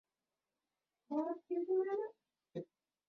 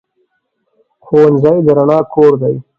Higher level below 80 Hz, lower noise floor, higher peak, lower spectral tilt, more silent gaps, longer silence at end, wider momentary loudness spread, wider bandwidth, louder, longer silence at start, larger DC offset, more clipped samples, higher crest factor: second, under -90 dBFS vs -52 dBFS; first, under -90 dBFS vs -65 dBFS; second, -28 dBFS vs 0 dBFS; second, -7.5 dB/octave vs -10 dB/octave; neither; first, 0.45 s vs 0.2 s; first, 14 LU vs 4 LU; second, 4.5 kHz vs 5.4 kHz; second, -40 LUFS vs -10 LUFS; about the same, 1.1 s vs 1.1 s; neither; neither; about the same, 16 dB vs 12 dB